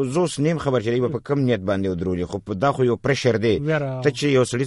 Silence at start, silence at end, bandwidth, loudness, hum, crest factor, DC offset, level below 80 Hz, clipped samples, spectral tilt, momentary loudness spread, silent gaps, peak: 0 s; 0 s; 11.5 kHz; -22 LUFS; none; 16 dB; under 0.1%; -50 dBFS; under 0.1%; -6 dB/octave; 5 LU; none; -4 dBFS